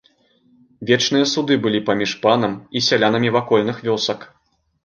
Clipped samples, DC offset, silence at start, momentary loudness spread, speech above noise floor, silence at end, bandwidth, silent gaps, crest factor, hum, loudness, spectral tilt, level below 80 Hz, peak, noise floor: under 0.1%; under 0.1%; 0.8 s; 6 LU; 40 dB; 0.6 s; 10 kHz; none; 18 dB; none; -18 LUFS; -4.5 dB/octave; -60 dBFS; -2 dBFS; -58 dBFS